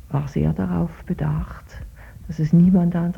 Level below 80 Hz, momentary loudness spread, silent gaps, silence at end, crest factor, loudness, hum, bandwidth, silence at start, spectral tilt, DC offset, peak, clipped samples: -38 dBFS; 24 LU; none; 0 s; 16 dB; -20 LUFS; none; 6.4 kHz; 0.05 s; -10 dB/octave; under 0.1%; -6 dBFS; under 0.1%